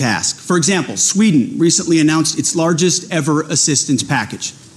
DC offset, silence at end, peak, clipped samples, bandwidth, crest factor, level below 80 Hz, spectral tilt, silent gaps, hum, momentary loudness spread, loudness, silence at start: under 0.1%; 0.2 s; -4 dBFS; under 0.1%; 13.5 kHz; 12 dB; -56 dBFS; -3.5 dB/octave; none; none; 5 LU; -14 LUFS; 0 s